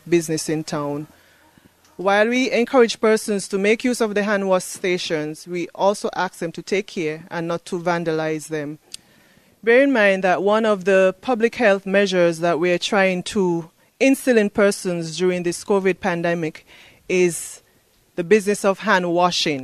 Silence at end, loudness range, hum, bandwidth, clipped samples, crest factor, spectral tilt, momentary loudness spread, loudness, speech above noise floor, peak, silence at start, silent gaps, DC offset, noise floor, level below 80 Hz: 0 s; 6 LU; none; 15 kHz; under 0.1%; 18 dB; -4.5 dB/octave; 11 LU; -20 LUFS; 39 dB; -2 dBFS; 0.05 s; none; under 0.1%; -58 dBFS; -62 dBFS